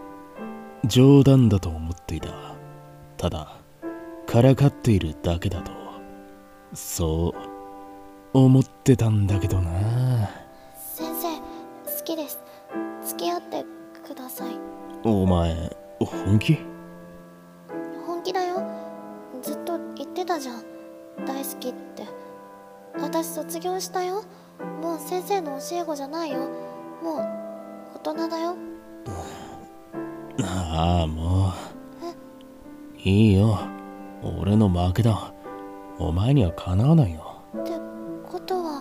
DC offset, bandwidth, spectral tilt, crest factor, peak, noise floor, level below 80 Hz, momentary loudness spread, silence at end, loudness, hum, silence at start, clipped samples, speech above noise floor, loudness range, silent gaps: under 0.1%; 16 kHz; -7 dB/octave; 20 dB; -4 dBFS; -47 dBFS; -44 dBFS; 21 LU; 0 s; -24 LUFS; none; 0 s; under 0.1%; 25 dB; 10 LU; none